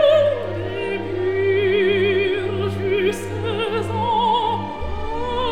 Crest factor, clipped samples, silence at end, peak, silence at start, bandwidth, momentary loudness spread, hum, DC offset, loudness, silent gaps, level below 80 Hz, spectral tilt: 16 dB; under 0.1%; 0 s; -4 dBFS; 0 s; 13 kHz; 8 LU; none; 1%; -21 LUFS; none; -38 dBFS; -6 dB/octave